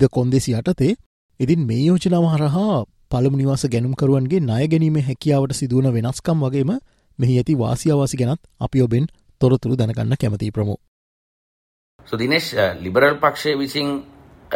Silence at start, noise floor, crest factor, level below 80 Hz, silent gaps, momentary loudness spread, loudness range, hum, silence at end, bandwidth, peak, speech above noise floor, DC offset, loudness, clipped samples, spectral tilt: 0 s; under -90 dBFS; 16 dB; -46 dBFS; 1.06-1.29 s, 10.88-11.99 s; 7 LU; 3 LU; none; 0 s; 16 kHz; -2 dBFS; over 72 dB; under 0.1%; -19 LUFS; under 0.1%; -6.5 dB/octave